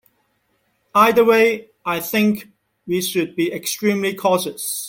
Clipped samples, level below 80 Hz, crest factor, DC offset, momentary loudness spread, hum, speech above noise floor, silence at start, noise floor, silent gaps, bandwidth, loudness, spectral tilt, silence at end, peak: under 0.1%; -64 dBFS; 18 dB; under 0.1%; 11 LU; none; 48 dB; 0.95 s; -66 dBFS; none; 17 kHz; -18 LUFS; -4 dB/octave; 0 s; -2 dBFS